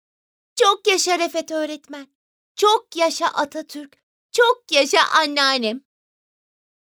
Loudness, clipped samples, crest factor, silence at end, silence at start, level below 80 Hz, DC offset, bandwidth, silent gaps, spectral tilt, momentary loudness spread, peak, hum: -19 LUFS; under 0.1%; 20 dB; 1.2 s; 0.55 s; -78 dBFS; under 0.1%; over 20 kHz; 2.15-2.55 s, 4.03-4.29 s; -0.5 dB/octave; 19 LU; -2 dBFS; none